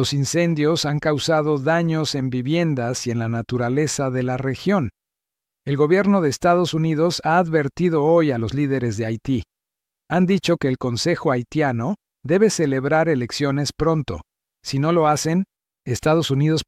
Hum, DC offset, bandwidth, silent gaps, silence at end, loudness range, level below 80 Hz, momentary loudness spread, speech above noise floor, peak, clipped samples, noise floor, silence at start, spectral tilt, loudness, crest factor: none; under 0.1%; 15 kHz; none; 0.05 s; 3 LU; -50 dBFS; 7 LU; 67 dB; -4 dBFS; under 0.1%; -86 dBFS; 0 s; -5.5 dB/octave; -20 LUFS; 16 dB